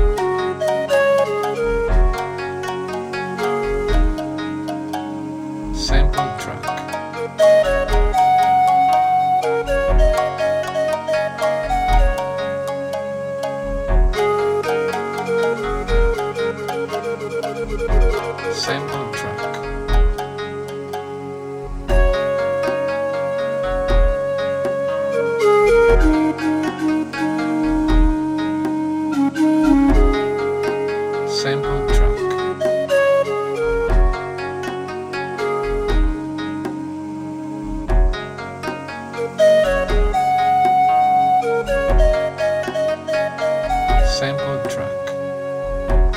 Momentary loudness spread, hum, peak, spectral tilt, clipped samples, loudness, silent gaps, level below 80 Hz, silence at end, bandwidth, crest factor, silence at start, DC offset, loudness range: 11 LU; none; -2 dBFS; -6 dB/octave; under 0.1%; -19 LUFS; none; -22 dBFS; 0 s; 12.5 kHz; 16 dB; 0 s; under 0.1%; 7 LU